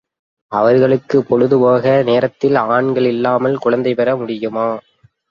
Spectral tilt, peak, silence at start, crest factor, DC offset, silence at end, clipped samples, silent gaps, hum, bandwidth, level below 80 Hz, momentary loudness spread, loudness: -8.5 dB/octave; -2 dBFS; 0.5 s; 14 dB; under 0.1%; 0.5 s; under 0.1%; none; none; 7 kHz; -58 dBFS; 8 LU; -15 LUFS